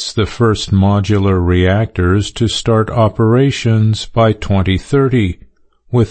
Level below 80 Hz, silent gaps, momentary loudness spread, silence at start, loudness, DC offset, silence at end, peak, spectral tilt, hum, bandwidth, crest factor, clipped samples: -32 dBFS; none; 4 LU; 0 s; -13 LUFS; under 0.1%; 0 s; -2 dBFS; -6.5 dB/octave; none; 8.8 kHz; 12 dB; under 0.1%